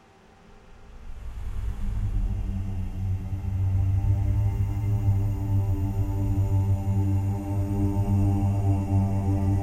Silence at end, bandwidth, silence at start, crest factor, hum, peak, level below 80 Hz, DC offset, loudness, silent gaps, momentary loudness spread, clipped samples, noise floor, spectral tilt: 0 s; 8.8 kHz; 0.5 s; 12 dB; none; -12 dBFS; -32 dBFS; under 0.1%; -26 LUFS; none; 9 LU; under 0.1%; -53 dBFS; -9.5 dB/octave